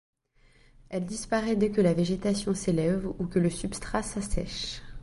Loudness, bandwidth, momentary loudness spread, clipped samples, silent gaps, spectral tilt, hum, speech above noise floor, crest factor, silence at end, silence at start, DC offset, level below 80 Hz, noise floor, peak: -29 LUFS; 11.5 kHz; 10 LU; under 0.1%; none; -5.5 dB/octave; none; 34 dB; 18 dB; 0 s; 0.9 s; under 0.1%; -44 dBFS; -61 dBFS; -10 dBFS